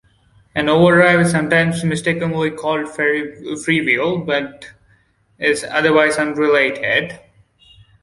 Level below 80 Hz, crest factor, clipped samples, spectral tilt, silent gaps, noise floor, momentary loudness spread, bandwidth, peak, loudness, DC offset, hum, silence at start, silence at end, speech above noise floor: -52 dBFS; 16 dB; under 0.1%; -5 dB/octave; none; -57 dBFS; 9 LU; 11.5 kHz; -2 dBFS; -16 LUFS; under 0.1%; none; 0.55 s; 0.85 s; 40 dB